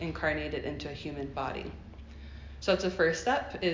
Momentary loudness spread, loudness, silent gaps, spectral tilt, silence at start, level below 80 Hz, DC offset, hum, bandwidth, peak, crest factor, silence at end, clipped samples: 20 LU; -32 LUFS; none; -5 dB/octave; 0 s; -48 dBFS; under 0.1%; none; 7.6 kHz; -14 dBFS; 18 dB; 0 s; under 0.1%